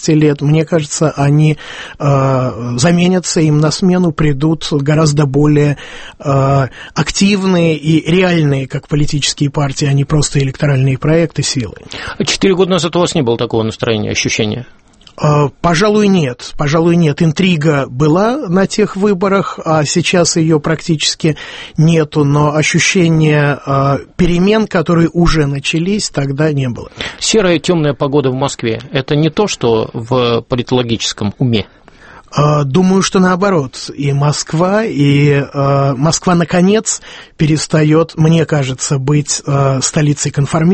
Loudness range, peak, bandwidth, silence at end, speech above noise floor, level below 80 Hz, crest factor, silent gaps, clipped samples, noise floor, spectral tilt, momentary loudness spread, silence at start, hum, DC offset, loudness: 2 LU; 0 dBFS; 8.8 kHz; 0 s; 27 dB; -34 dBFS; 12 dB; none; under 0.1%; -38 dBFS; -5.5 dB/octave; 6 LU; 0 s; none; under 0.1%; -12 LUFS